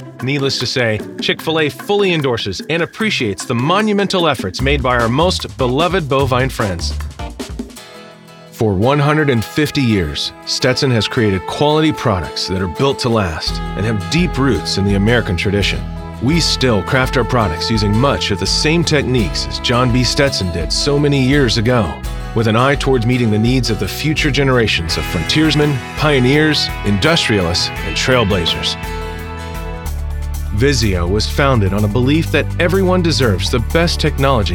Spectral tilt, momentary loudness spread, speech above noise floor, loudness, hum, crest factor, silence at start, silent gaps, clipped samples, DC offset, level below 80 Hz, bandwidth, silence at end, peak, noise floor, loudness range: -5 dB/octave; 8 LU; 23 dB; -15 LUFS; none; 14 dB; 0 s; none; under 0.1%; under 0.1%; -26 dBFS; 18.5 kHz; 0 s; 0 dBFS; -38 dBFS; 3 LU